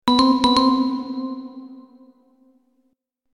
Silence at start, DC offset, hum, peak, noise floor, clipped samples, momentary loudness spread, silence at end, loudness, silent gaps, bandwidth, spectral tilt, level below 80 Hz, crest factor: 0.05 s; under 0.1%; none; -4 dBFS; -69 dBFS; under 0.1%; 21 LU; 1.55 s; -19 LUFS; none; 10.5 kHz; -4 dB/octave; -52 dBFS; 18 dB